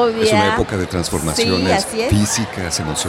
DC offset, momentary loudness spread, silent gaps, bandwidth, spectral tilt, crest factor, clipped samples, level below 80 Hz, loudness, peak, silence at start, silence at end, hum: under 0.1%; 6 LU; none; 16.5 kHz; -4 dB/octave; 14 dB; under 0.1%; -34 dBFS; -17 LUFS; -2 dBFS; 0 s; 0 s; none